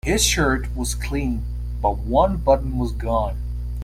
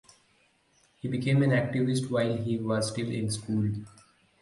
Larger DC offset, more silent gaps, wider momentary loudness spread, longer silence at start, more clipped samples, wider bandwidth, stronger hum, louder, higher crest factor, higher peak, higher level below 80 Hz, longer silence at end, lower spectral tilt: neither; neither; about the same, 10 LU vs 8 LU; second, 0.05 s vs 1.05 s; neither; first, 15.5 kHz vs 11.5 kHz; first, 60 Hz at -25 dBFS vs none; first, -22 LUFS vs -29 LUFS; about the same, 18 dB vs 16 dB; first, -4 dBFS vs -14 dBFS; first, -26 dBFS vs -60 dBFS; second, 0 s vs 0.55 s; second, -4.5 dB/octave vs -6 dB/octave